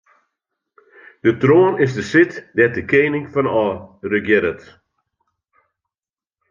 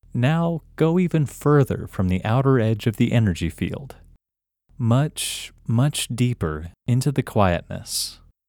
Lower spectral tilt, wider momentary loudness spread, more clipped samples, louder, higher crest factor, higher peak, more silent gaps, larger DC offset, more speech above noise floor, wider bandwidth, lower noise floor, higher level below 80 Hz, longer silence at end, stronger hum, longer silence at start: about the same, -7 dB/octave vs -6 dB/octave; about the same, 9 LU vs 8 LU; neither; first, -17 LUFS vs -22 LUFS; about the same, 18 dB vs 20 dB; about the same, -2 dBFS vs -2 dBFS; neither; neither; first, over 73 dB vs 65 dB; second, 7.4 kHz vs 18.5 kHz; first, under -90 dBFS vs -86 dBFS; second, -60 dBFS vs -44 dBFS; first, 1.95 s vs 0.35 s; neither; first, 1.25 s vs 0.15 s